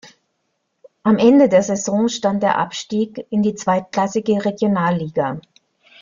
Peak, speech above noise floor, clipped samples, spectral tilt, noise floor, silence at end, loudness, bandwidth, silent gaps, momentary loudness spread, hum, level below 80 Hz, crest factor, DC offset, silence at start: -2 dBFS; 54 dB; under 0.1%; -5.5 dB/octave; -71 dBFS; 0.6 s; -18 LUFS; 7.4 kHz; none; 10 LU; none; -60 dBFS; 16 dB; under 0.1%; 0.05 s